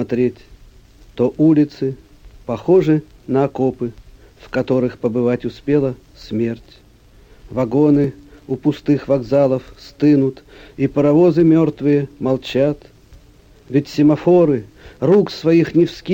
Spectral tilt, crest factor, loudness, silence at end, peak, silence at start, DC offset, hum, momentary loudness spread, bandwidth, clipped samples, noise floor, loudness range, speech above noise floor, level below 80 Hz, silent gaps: -8.5 dB/octave; 14 dB; -17 LUFS; 0 s; -4 dBFS; 0 s; under 0.1%; none; 12 LU; 15.5 kHz; under 0.1%; -47 dBFS; 5 LU; 31 dB; -46 dBFS; none